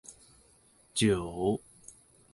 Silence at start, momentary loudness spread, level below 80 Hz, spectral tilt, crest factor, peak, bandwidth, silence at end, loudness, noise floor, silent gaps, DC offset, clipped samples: 0.1 s; 24 LU; -56 dBFS; -5 dB/octave; 20 dB; -14 dBFS; 11.5 kHz; 0.75 s; -31 LUFS; -63 dBFS; none; under 0.1%; under 0.1%